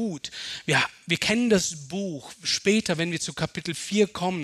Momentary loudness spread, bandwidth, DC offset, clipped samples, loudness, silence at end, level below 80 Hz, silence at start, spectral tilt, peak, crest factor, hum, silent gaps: 10 LU; 14 kHz; under 0.1%; under 0.1%; -25 LUFS; 0 s; -58 dBFS; 0 s; -3.5 dB/octave; -6 dBFS; 20 dB; none; none